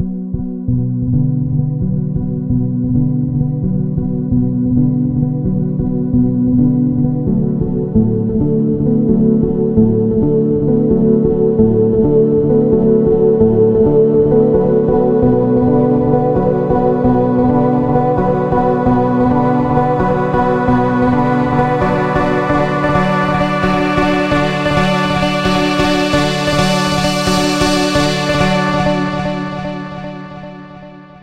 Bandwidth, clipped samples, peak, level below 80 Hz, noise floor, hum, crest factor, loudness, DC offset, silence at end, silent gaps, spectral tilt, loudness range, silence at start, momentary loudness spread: 13 kHz; under 0.1%; 0 dBFS; -30 dBFS; -34 dBFS; none; 14 dB; -14 LUFS; under 0.1%; 0.15 s; none; -7 dB/octave; 5 LU; 0 s; 6 LU